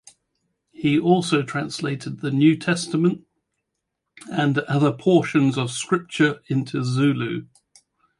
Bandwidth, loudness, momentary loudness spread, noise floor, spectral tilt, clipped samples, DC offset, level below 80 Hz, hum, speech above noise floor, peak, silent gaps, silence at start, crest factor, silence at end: 11.5 kHz; -21 LUFS; 9 LU; -79 dBFS; -6 dB/octave; under 0.1%; under 0.1%; -64 dBFS; none; 59 dB; -4 dBFS; none; 0.8 s; 18 dB; 0.75 s